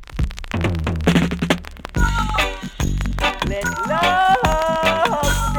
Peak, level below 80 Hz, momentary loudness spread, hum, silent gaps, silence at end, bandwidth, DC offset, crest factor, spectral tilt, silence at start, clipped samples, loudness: -2 dBFS; -26 dBFS; 8 LU; none; none; 0 s; 19.5 kHz; under 0.1%; 16 dB; -5 dB/octave; 0 s; under 0.1%; -19 LUFS